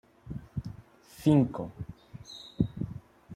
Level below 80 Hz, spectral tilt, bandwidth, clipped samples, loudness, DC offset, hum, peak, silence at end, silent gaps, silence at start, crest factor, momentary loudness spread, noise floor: -52 dBFS; -8 dB/octave; 15 kHz; under 0.1%; -31 LUFS; under 0.1%; none; -10 dBFS; 0 s; none; 0.25 s; 22 dB; 22 LU; -52 dBFS